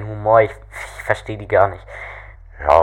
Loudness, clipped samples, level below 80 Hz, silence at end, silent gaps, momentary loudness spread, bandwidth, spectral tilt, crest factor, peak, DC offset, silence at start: -18 LUFS; under 0.1%; -38 dBFS; 0 s; none; 18 LU; 13 kHz; -6.5 dB/octave; 18 dB; 0 dBFS; under 0.1%; 0 s